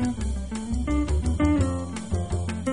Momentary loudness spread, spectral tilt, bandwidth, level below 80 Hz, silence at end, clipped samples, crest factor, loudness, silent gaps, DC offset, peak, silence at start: 8 LU; -7 dB/octave; 10.5 kHz; -30 dBFS; 0 s; under 0.1%; 14 dB; -27 LUFS; none; 0.5%; -10 dBFS; 0 s